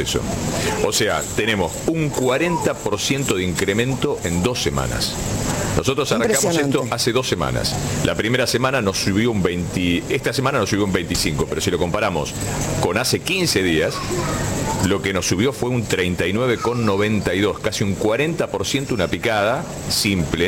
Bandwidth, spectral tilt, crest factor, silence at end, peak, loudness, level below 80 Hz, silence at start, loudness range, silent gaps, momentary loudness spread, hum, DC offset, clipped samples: 17 kHz; -4 dB/octave; 16 dB; 0 s; -4 dBFS; -20 LUFS; -38 dBFS; 0 s; 1 LU; none; 4 LU; none; under 0.1%; under 0.1%